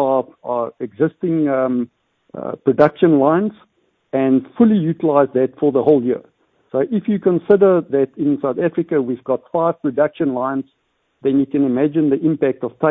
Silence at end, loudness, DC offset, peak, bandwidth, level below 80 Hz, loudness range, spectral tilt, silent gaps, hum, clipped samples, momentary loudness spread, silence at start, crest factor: 0 s; -17 LUFS; under 0.1%; 0 dBFS; 4.5 kHz; -58 dBFS; 3 LU; -11 dB/octave; none; none; under 0.1%; 10 LU; 0 s; 16 dB